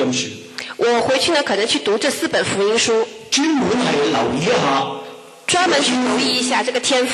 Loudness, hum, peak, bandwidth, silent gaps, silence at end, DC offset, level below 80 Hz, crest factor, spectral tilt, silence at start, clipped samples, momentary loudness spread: -17 LUFS; none; -4 dBFS; 13 kHz; none; 0 s; under 0.1%; -56 dBFS; 14 dB; -3 dB/octave; 0 s; under 0.1%; 8 LU